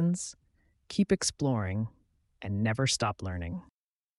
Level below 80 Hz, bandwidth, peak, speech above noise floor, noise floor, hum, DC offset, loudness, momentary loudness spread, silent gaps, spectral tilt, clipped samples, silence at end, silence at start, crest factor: -54 dBFS; 11.5 kHz; -14 dBFS; 39 dB; -70 dBFS; none; under 0.1%; -31 LUFS; 12 LU; none; -4.5 dB/octave; under 0.1%; 0.55 s; 0 s; 18 dB